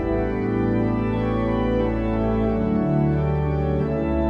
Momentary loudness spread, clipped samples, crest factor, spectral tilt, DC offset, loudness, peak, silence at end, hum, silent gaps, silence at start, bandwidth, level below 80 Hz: 2 LU; under 0.1%; 12 dB; -10.5 dB/octave; under 0.1%; -22 LUFS; -10 dBFS; 0 s; none; none; 0 s; 5.6 kHz; -32 dBFS